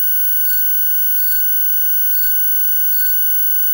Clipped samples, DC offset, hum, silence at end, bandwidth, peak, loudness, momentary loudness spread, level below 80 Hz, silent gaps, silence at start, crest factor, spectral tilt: under 0.1%; under 0.1%; none; 0 s; 16.5 kHz; -6 dBFS; -11 LUFS; 0 LU; -50 dBFS; none; 0 s; 8 dB; 3.5 dB/octave